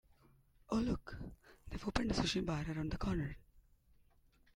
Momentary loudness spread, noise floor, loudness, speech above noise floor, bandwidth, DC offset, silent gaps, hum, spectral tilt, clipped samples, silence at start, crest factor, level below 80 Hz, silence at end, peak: 15 LU; -69 dBFS; -39 LUFS; 31 dB; 16 kHz; under 0.1%; none; none; -5.5 dB/octave; under 0.1%; 0.7 s; 24 dB; -50 dBFS; 0.95 s; -18 dBFS